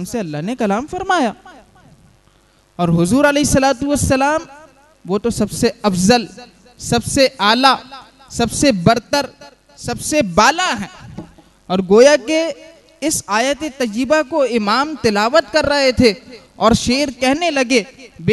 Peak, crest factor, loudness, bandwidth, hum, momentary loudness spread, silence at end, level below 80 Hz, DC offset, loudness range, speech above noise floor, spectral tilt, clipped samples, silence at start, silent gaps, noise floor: 0 dBFS; 16 dB; -15 LUFS; 12.5 kHz; none; 11 LU; 0 s; -40 dBFS; under 0.1%; 3 LU; 38 dB; -4 dB/octave; under 0.1%; 0 s; none; -53 dBFS